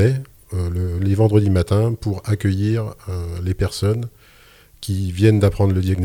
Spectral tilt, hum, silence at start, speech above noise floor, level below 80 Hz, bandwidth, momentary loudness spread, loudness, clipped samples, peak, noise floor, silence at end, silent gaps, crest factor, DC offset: -7.5 dB/octave; none; 0 s; 31 dB; -38 dBFS; 14.5 kHz; 12 LU; -20 LUFS; under 0.1%; -2 dBFS; -49 dBFS; 0 s; none; 16 dB; under 0.1%